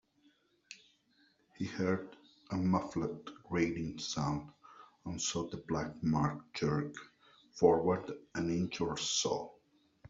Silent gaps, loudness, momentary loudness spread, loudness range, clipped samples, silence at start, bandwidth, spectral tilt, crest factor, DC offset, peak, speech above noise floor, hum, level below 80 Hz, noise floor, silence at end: none; -35 LUFS; 19 LU; 4 LU; under 0.1%; 0.7 s; 7.8 kHz; -5 dB/octave; 22 dB; under 0.1%; -14 dBFS; 36 dB; none; -62 dBFS; -71 dBFS; 0 s